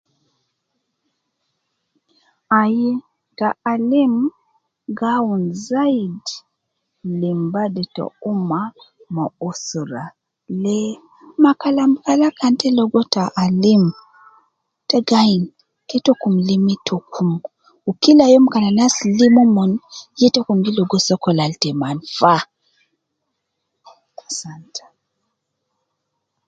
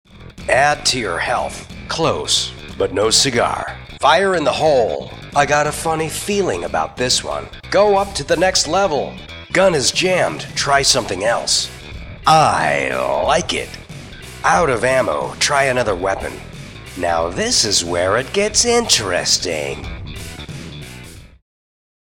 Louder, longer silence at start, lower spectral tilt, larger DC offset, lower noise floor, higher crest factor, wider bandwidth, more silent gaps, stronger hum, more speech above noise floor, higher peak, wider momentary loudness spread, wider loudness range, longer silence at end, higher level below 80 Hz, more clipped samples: about the same, -17 LUFS vs -16 LUFS; first, 2.5 s vs 0.15 s; first, -5.5 dB/octave vs -2.5 dB/octave; neither; first, -75 dBFS vs -37 dBFS; about the same, 18 dB vs 18 dB; second, 9 kHz vs 18.5 kHz; neither; neither; first, 59 dB vs 20 dB; about the same, 0 dBFS vs 0 dBFS; about the same, 16 LU vs 17 LU; first, 10 LU vs 2 LU; first, 1.7 s vs 0.9 s; second, -62 dBFS vs -40 dBFS; neither